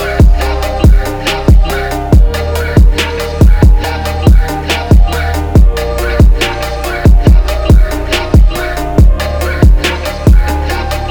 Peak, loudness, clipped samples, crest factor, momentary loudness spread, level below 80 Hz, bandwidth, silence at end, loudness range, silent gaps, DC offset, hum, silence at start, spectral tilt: 0 dBFS; -11 LUFS; 0.4%; 8 dB; 6 LU; -10 dBFS; 20 kHz; 0 s; 1 LU; none; under 0.1%; none; 0 s; -6 dB/octave